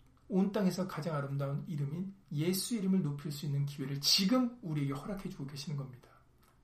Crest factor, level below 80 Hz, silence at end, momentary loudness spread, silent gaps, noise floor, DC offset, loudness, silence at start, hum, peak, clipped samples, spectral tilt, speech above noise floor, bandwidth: 20 dB; -64 dBFS; 0.65 s; 14 LU; none; -64 dBFS; under 0.1%; -34 LUFS; 0.3 s; none; -14 dBFS; under 0.1%; -5 dB/octave; 30 dB; 15.5 kHz